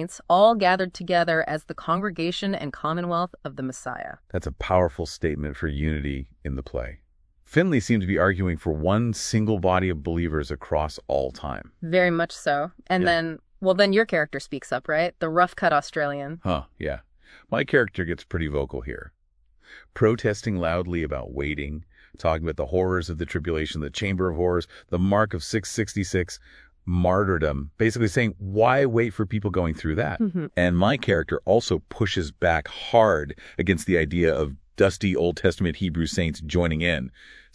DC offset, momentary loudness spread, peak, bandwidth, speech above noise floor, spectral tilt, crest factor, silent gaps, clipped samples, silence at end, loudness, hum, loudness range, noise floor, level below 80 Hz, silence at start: under 0.1%; 11 LU; -4 dBFS; 11 kHz; 38 dB; -6 dB/octave; 22 dB; none; under 0.1%; 0.2 s; -24 LUFS; none; 5 LU; -62 dBFS; -40 dBFS; 0 s